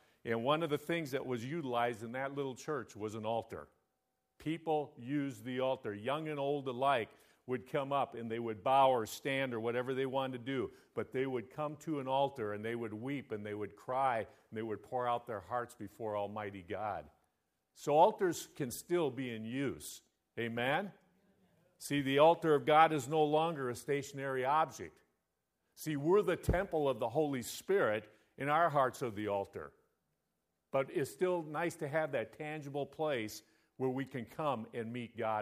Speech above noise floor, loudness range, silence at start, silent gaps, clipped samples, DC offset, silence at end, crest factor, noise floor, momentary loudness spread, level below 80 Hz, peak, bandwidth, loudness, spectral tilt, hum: 50 dB; 8 LU; 0.25 s; none; under 0.1%; under 0.1%; 0 s; 24 dB; -85 dBFS; 13 LU; -62 dBFS; -12 dBFS; 15.5 kHz; -36 LUFS; -5.5 dB/octave; none